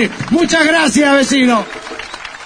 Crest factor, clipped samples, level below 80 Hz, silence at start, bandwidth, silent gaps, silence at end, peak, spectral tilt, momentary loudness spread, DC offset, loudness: 14 dB; under 0.1%; -44 dBFS; 0 s; 10.5 kHz; none; 0 s; 0 dBFS; -3.5 dB/octave; 15 LU; under 0.1%; -11 LUFS